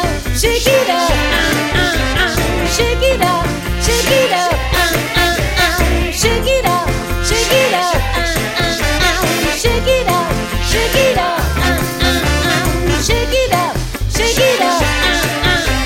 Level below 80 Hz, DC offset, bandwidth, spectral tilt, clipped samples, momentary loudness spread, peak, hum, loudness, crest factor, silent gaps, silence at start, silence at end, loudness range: -22 dBFS; under 0.1%; 16.5 kHz; -3.5 dB/octave; under 0.1%; 4 LU; 0 dBFS; none; -14 LUFS; 14 dB; none; 0 s; 0 s; 1 LU